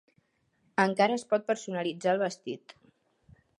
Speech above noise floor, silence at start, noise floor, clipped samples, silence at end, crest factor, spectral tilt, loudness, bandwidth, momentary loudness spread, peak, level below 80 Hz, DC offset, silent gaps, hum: 43 dB; 0.8 s; -72 dBFS; under 0.1%; 1.05 s; 22 dB; -5 dB/octave; -29 LUFS; 11.5 kHz; 14 LU; -8 dBFS; -76 dBFS; under 0.1%; none; none